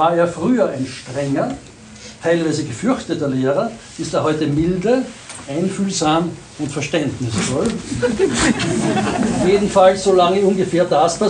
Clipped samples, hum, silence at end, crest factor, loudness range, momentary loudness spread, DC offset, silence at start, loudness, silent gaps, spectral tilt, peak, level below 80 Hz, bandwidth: under 0.1%; none; 0 s; 16 dB; 5 LU; 12 LU; under 0.1%; 0 s; -18 LUFS; none; -5 dB/octave; 0 dBFS; -44 dBFS; 10.5 kHz